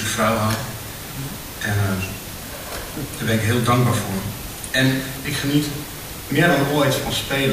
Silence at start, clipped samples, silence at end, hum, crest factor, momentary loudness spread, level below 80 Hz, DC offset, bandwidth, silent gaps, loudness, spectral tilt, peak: 0 s; under 0.1%; 0 s; none; 18 dB; 13 LU; -42 dBFS; 0.2%; 16 kHz; none; -22 LUFS; -4.5 dB/octave; -4 dBFS